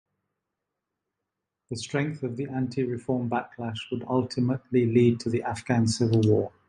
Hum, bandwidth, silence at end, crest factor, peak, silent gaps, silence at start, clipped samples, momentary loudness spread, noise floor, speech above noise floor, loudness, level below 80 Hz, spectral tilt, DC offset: none; 11 kHz; 0.2 s; 18 dB; -8 dBFS; none; 1.7 s; under 0.1%; 11 LU; -85 dBFS; 59 dB; -27 LUFS; -58 dBFS; -6.5 dB/octave; under 0.1%